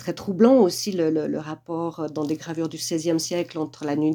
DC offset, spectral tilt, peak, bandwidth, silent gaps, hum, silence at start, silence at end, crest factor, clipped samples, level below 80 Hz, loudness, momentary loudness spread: under 0.1%; -5 dB/octave; -4 dBFS; 19 kHz; none; none; 0 s; 0 s; 18 dB; under 0.1%; -66 dBFS; -24 LUFS; 12 LU